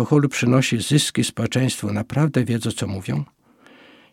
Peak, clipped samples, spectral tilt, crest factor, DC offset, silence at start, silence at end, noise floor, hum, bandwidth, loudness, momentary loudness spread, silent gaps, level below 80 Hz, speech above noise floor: -2 dBFS; under 0.1%; -5 dB/octave; 18 dB; under 0.1%; 0 s; 0.9 s; -51 dBFS; none; 16.5 kHz; -21 LUFS; 9 LU; none; -58 dBFS; 31 dB